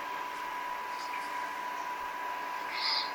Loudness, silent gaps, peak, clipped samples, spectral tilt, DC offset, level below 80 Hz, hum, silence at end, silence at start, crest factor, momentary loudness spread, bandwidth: -36 LUFS; none; -18 dBFS; under 0.1%; -0.5 dB/octave; under 0.1%; -72 dBFS; none; 0 s; 0 s; 18 dB; 6 LU; 17.5 kHz